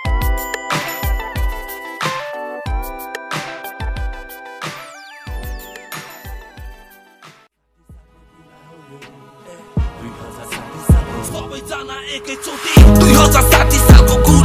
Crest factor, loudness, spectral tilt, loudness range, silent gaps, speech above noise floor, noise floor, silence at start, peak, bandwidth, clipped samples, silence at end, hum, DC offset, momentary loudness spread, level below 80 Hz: 16 dB; -15 LUFS; -5 dB/octave; 22 LU; none; 45 dB; -55 dBFS; 0 s; 0 dBFS; 16 kHz; 1%; 0 s; none; under 0.1%; 24 LU; -18 dBFS